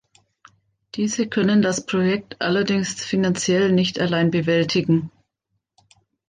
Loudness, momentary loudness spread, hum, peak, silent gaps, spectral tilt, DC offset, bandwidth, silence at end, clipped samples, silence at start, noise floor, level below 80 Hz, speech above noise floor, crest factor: -20 LUFS; 6 LU; none; -8 dBFS; none; -5 dB/octave; under 0.1%; 9.6 kHz; 1.2 s; under 0.1%; 0.95 s; -76 dBFS; -60 dBFS; 56 dB; 14 dB